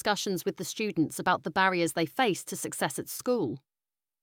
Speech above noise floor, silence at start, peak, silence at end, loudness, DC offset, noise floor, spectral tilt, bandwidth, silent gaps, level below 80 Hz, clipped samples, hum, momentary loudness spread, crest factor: over 61 dB; 0.05 s; -12 dBFS; 0.65 s; -29 LUFS; under 0.1%; under -90 dBFS; -3.5 dB/octave; 18.5 kHz; none; -70 dBFS; under 0.1%; none; 8 LU; 18 dB